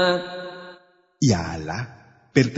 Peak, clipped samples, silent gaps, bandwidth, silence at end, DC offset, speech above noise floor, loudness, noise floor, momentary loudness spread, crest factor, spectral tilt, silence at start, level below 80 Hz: -2 dBFS; under 0.1%; none; 8 kHz; 0 s; under 0.1%; 30 dB; -24 LUFS; -52 dBFS; 17 LU; 22 dB; -5.5 dB/octave; 0 s; -50 dBFS